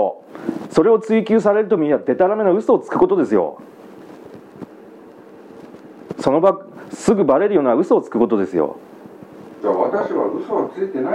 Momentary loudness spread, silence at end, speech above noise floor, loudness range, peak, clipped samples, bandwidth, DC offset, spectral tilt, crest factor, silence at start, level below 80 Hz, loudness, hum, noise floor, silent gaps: 19 LU; 0 s; 25 dB; 7 LU; 0 dBFS; under 0.1%; 11 kHz; under 0.1%; -7 dB/octave; 18 dB; 0 s; -58 dBFS; -17 LUFS; none; -41 dBFS; none